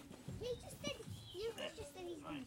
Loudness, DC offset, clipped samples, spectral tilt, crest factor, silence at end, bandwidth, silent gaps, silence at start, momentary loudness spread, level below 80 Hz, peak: -48 LUFS; under 0.1%; under 0.1%; -4.5 dB/octave; 20 dB; 0 s; 16.5 kHz; none; 0 s; 5 LU; -66 dBFS; -28 dBFS